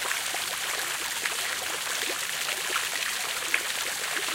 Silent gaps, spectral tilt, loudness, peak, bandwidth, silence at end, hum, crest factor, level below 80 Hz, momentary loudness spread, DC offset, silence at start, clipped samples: none; 1.5 dB/octave; -28 LUFS; -8 dBFS; 17 kHz; 0 s; none; 22 dB; -66 dBFS; 2 LU; under 0.1%; 0 s; under 0.1%